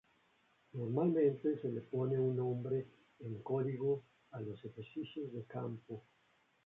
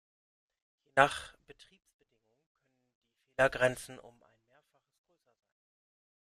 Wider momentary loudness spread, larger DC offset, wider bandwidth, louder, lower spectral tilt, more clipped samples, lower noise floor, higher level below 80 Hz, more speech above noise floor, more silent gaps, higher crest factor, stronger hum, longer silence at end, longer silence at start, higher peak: second, 16 LU vs 19 LU; neither; second, 3.9 kHz vs 14.5 kHz; second, -39 LUFS vs -30 LUFS; first, -9 dB/octave vs -4 dB/octave; neither; about the same, -74 dBFS vs -72 dBFS; second, -78 dBFS vs -66 dBFS; second, 36 dB vs 42 dB; second, none vs 1.94-1.99 s, 2.46-2.55 s, 2.95-3.01 s; second, 16 dB vs 32 dB; neither; second, 0.65 s vs 2.3 s; second, 0.75 s vs 0.95 s; second, -22 dBFS vs -6 dBFS